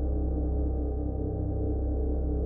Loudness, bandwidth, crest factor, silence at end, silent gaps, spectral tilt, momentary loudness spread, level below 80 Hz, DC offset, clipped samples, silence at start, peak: -31 LUFS; 1.6 kHz; 10 dB; 0 s; none; -13 dB/octave; 2 LU; -30 dBFS; under 0.1%; under 0.1%; 0 s; -18 dBFS